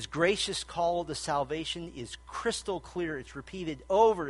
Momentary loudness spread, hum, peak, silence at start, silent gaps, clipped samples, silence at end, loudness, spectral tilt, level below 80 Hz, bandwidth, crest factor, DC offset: 13 LU; none; -12 dBFS; 0 s; none; under 0.1%; 0 s; -32 LUFS; -3.5 dB/octave; -54 dBFS; 11.5 kHz; 20 dB; under 0.1%